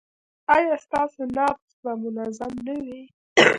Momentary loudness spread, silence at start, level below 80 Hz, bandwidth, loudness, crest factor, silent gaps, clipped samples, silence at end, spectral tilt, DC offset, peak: 14 LU; 0.5 s; -60 dBFS; 11.5 kHz; -24 LUFS; 24 dB; 1.62-1.83 s, 3.14-3.36 s; under 0.1%; 0 s; -3.5 dB/octave; under 0.1%; 0 dBFS